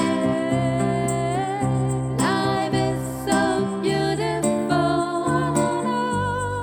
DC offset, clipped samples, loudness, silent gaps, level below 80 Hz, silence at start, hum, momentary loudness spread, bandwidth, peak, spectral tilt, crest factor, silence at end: under 0.1%; under 0.1%; -22 LUFS; none; -46 dBFS; 0 s; none; 3 LU; 19 kHz; -6 dBFS; -5.5 dB/octave; 16 dB; 0 s